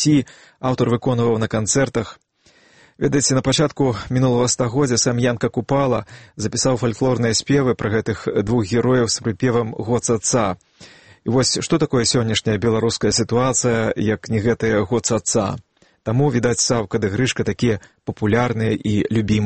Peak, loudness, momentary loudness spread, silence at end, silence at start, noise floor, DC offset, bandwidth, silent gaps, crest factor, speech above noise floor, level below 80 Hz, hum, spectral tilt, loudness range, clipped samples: -2 dBFS; -19 LUFS; 7 LU; 0 s; 0 s; -54 dBFS; 0.2%; 8.8 kHz; none; 16 dB; 36 dB; -46 dBFS; none; -4.5 dB/octave; 2 LU; under 0.1%